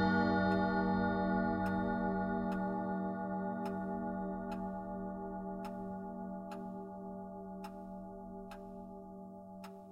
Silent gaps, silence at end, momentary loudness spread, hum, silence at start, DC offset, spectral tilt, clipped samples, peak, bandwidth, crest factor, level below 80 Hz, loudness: none; 0 s; 16 LU; none; 0 s; under 0.1%; -8.5 dB/octave; under 0.1%; -20 dBFS; 5.8 kHz; 18 dB; -58 dBFS; -38 LUFS